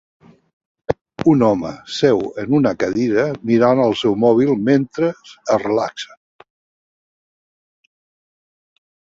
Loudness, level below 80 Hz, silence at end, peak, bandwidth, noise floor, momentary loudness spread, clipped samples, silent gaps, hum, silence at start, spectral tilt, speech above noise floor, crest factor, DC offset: -17 LUFS; -54 dBFS; 2.95 s; -2 dBFS; 7.8 kHz; under -90 dBFS; 11 LU; under 0.1%; 1.01-1.05 s; none; 0.9 s; -6.5 dB/octave; over 74 dB; 18 dB; under 0.1%